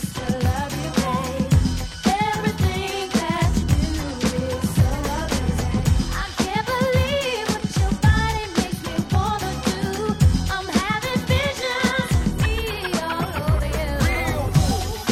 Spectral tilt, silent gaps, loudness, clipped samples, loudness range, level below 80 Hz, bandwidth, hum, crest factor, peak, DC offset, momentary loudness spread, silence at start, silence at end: -5.5 dB/octave; none; -22 LUFS; under 0.1%; 1 LU; -28 dBFS; 16 kHz; none; 16 dB; -4 dBFS; under 0.1%; 5 LU; 0 s; 0 s